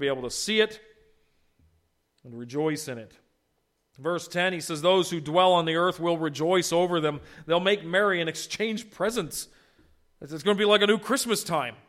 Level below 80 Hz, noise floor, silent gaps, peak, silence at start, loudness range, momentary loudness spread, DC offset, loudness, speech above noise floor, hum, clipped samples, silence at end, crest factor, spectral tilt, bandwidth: -64 dBFS; -74 dBFS; none; -6 dBFS; 0 s; 8 LU; 14 LU; under 0.1%; -25 LUFS; 48 dB; none; under 0.1%; 0.15 s; 20 dB; -3.5 dB/octave; 16 kHz